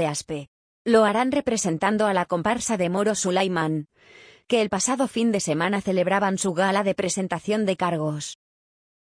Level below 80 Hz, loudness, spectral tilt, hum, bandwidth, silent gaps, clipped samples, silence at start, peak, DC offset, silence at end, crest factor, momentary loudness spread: -60 dBFS; -23 LUFS; -4.5 dB/octave; none; 10.5 kHz; 0.48-0.85 s; under 0.1%; 0 s; -6 dBFS; under 0.1%; 0.7 s; 18 dB; 8 LU